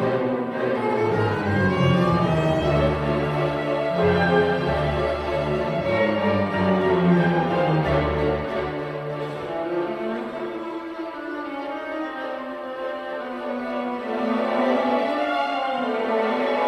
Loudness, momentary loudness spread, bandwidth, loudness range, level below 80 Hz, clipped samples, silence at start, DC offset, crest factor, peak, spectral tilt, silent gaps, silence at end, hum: -23 LUFS; 11 LU; 12 kHz; 8 LU; -42 dBFS; under 0.1%; 0 s; under 0.1%; 16 dB; -6 dBFS; -7.5 dB/octave; none; 0 s; none